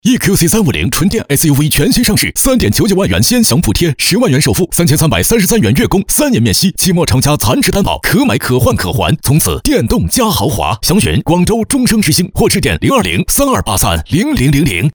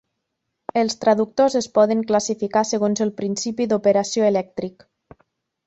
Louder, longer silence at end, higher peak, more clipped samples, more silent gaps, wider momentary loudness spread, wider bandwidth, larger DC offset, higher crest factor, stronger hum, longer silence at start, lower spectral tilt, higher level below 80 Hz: first, -10 LUFS vs -20 LUFS; second, 0.05 s vs 0.95 s; first, 0 dBFS vs -4 dBFS; neither; neither; second, 3 LU vs 8 LU; first, over 20 kHz vs 8.2 kHz; neither; second, 10 dB vs 18 dB; neither; second, 0.05 s vs 0.75 s; about the same, -4.5 dB/octave vs -4.5 dB/octave; first, -26 dBFS vs -62 dBFS